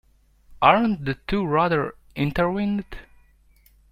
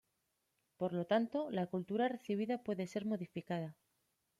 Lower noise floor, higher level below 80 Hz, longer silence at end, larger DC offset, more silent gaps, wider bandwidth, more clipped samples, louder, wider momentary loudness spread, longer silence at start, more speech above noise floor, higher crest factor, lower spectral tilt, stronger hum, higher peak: second, -57 dBFS vs -84 dBFS; first, -44 dBFS vs -82 dBFS; first, 0.9 s vs 0.65 s; neither; neither; first, 15 kHz vs 13 kHz; neither; first, -22 LUFS vs -39 LUFS; first, 13 LU vs 8 LU; second, 0.5 s vs 0.8 s; second, 35 dB vs 46 dB; about the same, 22 dB vs 20 dB; about the same, -8 dB/octave vs -7 dB/octave; neither; first, -2 dBFS vs -20 dBFS